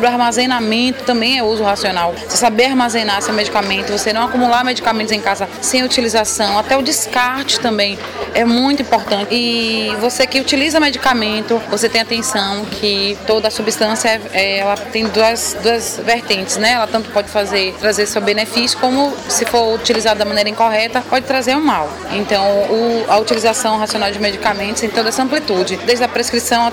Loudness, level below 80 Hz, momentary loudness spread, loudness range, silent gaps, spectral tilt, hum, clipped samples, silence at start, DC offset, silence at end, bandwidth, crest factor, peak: -14 LUFS; -46 dBFS; 4 LU; 1 LU; none; -2.5 dB/octave; none; under 0.1%; 0 s; under 0.1%; 0 s; over 20 kHz; 12 dB; -2 dBFS